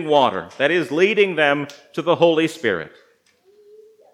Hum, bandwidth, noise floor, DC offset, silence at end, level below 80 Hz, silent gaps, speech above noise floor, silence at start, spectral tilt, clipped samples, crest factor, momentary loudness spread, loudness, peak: none; 13.5 kHz; -57 dBFS; under 0.1%; 1.25 s; -72 dBFS; none; 39 dB; 0 s; -5 dB/octave; under 0.1%; 18 dB; 10 LU; -19 LUFS; -2 dBFS